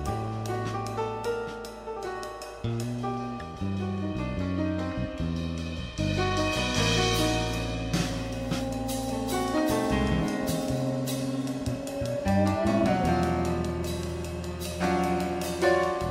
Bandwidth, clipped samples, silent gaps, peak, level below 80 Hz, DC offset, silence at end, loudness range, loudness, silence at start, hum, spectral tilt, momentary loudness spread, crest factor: 16 kHz; under 0.1%; none; -12 dBFS; -42 dBFS; under 0.1%; 0 s; 6 LU; -29 LUFS; 0 s; none; -5.5 dB/octave; 10 LU; 18 dB